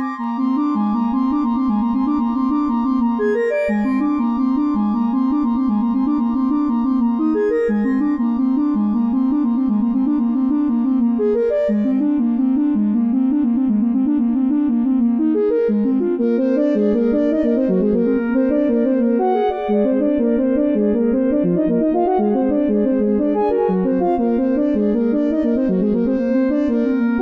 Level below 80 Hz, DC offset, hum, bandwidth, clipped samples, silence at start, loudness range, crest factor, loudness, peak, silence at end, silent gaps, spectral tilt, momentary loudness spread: -46 dBFS; under 0.1%; none; 5 kHz; under 0.1%; 0 s; 1 LU; 10 dB; -18 LUFS; -6 dBFS; 0 s; none; -10 dB/octave; 2 LU